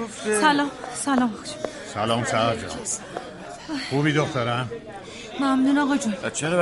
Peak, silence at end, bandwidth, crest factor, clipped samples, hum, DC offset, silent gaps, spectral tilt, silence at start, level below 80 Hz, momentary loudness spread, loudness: -6 dBFS; 0 s; 11.5 kHz; 18 dB; under 0.1%; none; under 0.1%; none; -4.5 dB/octave; 0 s; -56 dBFS; 15 LU; -24 LUFS